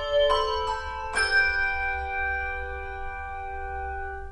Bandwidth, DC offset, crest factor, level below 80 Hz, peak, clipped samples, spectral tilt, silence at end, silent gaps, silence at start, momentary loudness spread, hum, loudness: 10.5 kHz; under 0.1%; 18 dB; -38 dBFS; -10 dBFS; under 0.1%; -2.5 dB/octave; 0 s; none; 0 s; 14 LU; none; -27 LUFS